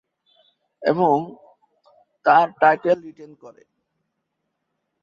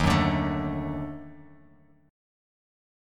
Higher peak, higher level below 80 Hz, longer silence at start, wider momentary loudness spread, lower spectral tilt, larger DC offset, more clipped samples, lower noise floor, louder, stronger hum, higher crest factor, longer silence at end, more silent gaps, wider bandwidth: first, -2 dBFS vs -10 dBFS; second, -70 dBFS vs -42 dBFS; first, 0.8 s vs 0 s; second, 11 LU vs 19 LU; about the same, -7.5 dB/octave vs -6.5 dB/octave; neither; neither; first, -77 dBFS vs -58 dBFS; first, -19 LUFS vs -28 LUFS; neither; about the same, 20 dB vs 20 dB; about the same, 1.55 s vs 1.65 s; neither; second, 7 kHz vs 15 kHz